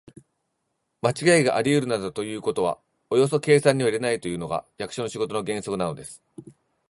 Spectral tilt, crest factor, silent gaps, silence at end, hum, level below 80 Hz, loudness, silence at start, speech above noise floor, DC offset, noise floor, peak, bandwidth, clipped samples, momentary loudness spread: -5 dB/octave; 22 dB; none; 0.4 s; none; -60 dBFS; -24 LUFS; 1.05 s; 53 dB; under 0.1%; -76 dBFS; -4 dBFS; 11.5 kHz; under 0.1%; 12 LU